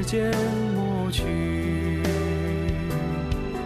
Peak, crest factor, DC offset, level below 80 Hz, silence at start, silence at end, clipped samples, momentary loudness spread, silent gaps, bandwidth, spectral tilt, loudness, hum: -12 dBFS; 14 dB; under 0.1%; -36 dBFS; 0 s; 0 s; under 0.1%; 3 LU; none; 14 kHz; -6.5 dB/octave; -26 LUFS; none